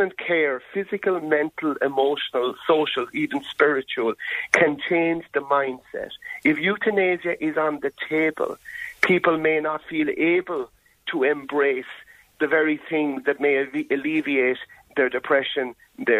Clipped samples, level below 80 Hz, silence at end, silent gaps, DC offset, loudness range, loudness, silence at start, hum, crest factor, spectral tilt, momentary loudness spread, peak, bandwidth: under 0.1%; -66 dBFS; 0 s; none; under 0.1%; 2 LU; -23 LUFS; 0 s; none; 22 dB; -5 dB/octave; 10 LU; -2 dBFS; 15 kHz